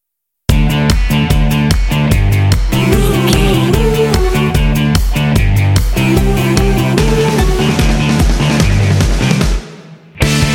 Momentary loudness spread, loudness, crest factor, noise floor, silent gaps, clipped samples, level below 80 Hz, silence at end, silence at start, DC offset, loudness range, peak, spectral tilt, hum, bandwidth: 2 LU; -12 LUFS; 10 dB; -34 dBFS; none; under 0.1%; -16 dBFS; 0 s; 0.5 s; under 0.1%; 1 LU; 0 dBFS; -5.5 dB/octave; none; 17 kHz